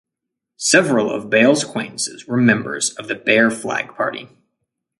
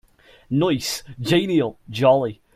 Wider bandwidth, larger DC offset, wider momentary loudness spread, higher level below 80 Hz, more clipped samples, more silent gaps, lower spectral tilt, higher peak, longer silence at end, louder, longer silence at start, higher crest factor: second, 11.5 kHz vs 16 kHz; neither; about the same, 10 LU vs 10 LU; second, -64 dBFS vs -54 dBFS; neither; neither; second, -3.5 dB/octave vs -5.5 dB/octave; first, 0 dBFS vs -4 dBFS; first, 0.75 s vs 0.25 s; first, -17 LUFS vs -21 LUFS; about the same, 0.6 s vs 0.5 s; about the same, 18 dB vs 18 dB